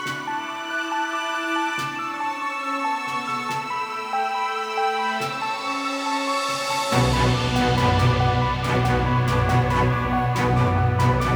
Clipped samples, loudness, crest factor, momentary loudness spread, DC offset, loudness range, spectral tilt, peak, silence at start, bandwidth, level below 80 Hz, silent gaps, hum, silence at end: under 0.1%; -22 LUFS; 16 dB; 7 LU; under 0.1%; 5 LU; -5.5 dB/octave; -8 dBFS; 0 s; over 20 kHz; -36 dBFS; none; none; 0 s